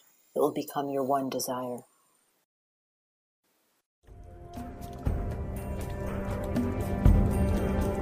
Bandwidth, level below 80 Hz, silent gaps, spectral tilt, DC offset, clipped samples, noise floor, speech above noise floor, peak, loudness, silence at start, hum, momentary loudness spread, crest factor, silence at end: 15.5 kHz; -36 dBFS; 2.45-3.43 s, 3.86-4.02 s; -7 dB/octave; under 0.1%; under 0.1%; -69 dBFS; 39 dB; -8 dBFS; -30 LUFS; 0.35 s; none; 17 LU; 22 dB; 0 s